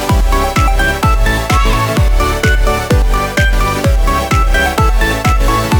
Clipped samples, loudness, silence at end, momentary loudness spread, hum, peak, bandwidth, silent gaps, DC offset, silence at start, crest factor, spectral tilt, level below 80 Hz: under 0.1%; -13 LUFS; 0 s; 1 LU; none; 0 dBFS; over 20 kHz; none; under 0.1%; 0 s; 10 dB; -5 dB/octave; -14 dBFS